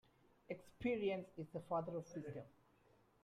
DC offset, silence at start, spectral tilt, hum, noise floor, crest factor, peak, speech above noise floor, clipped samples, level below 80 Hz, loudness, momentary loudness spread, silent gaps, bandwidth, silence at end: under 0.1%; 0.5 s; -7 dB/octave; none; -73 dBFS; 18 dB; -30 dBFS; 29 dB; under 0.1%; -74 dBFS; -46 LUFS; 12 LU; none; 14 kHz; 0.75 s